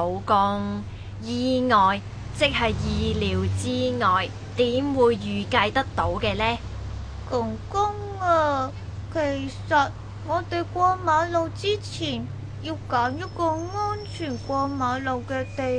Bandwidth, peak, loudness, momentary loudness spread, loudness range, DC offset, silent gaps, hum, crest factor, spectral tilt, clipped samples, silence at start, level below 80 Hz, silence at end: 10.5 kHz; -6 dBFS; -24 LUFS; 10 LU; 4 LU; under 0.1%; none; none; 18 dB; -5.5 dB/octave; under 0.1%; 0 s; -42 dBFS; 0 s